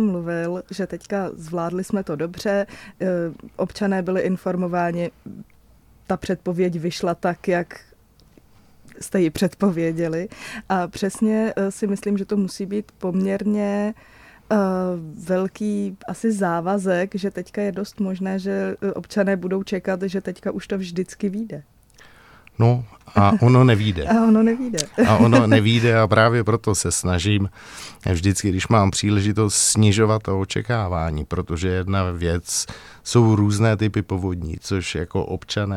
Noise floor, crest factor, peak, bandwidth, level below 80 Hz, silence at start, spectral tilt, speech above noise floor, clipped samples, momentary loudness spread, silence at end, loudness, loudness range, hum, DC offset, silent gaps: -53 dBFS; 20 dB; 0 dBFS; 14.5 kHz; -44 dBFS; 0 s; -5.5 dB/octave; 32 dB; under 0.1%; 12 LU; 0 s; -21 LUFS; 9 LU; none; under 0.1%; none